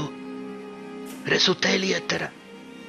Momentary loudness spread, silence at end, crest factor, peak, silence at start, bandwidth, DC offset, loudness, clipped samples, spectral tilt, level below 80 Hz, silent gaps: 19 LU; 0 s; 20 dB; -6 dBFS; 0 s; 14 kHz; under 0.1%; -23 LUFS; under 0.1%; -3 dB/octave; -66 dBFS; none